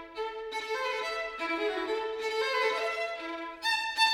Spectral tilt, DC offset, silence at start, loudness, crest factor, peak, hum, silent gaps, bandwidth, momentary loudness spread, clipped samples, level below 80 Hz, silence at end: -0.5 dB/octave; under 0.1%; 0 s; -31 LUFS; 18 dB; -14 dBFS; none; none; 18 kHz; 9 LU; under 0.1%; -66 dBFS; 0 s